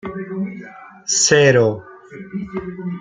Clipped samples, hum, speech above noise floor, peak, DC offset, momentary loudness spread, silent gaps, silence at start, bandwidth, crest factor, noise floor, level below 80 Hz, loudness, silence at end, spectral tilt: under 0.1%; none; 21 dB; -2 dBFS; under 0.1%; 22 LU; none; 0.05 s; 9.6 kHz; 18 dB; -38 dBFS; -54 dBFS; -17 LUFS; 0 s; -3.5 dB/octave